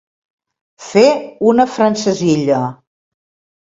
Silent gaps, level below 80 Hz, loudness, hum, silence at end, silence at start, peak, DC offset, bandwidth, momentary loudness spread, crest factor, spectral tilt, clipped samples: none; -58 dBFS; -14 LUFS; none; 0.9 s; 0.8 s; 0 dBFS; under 0.1%; 7.8 kHz; 6 LU; 16 dB; -5.5 dB/octave; under 0.1%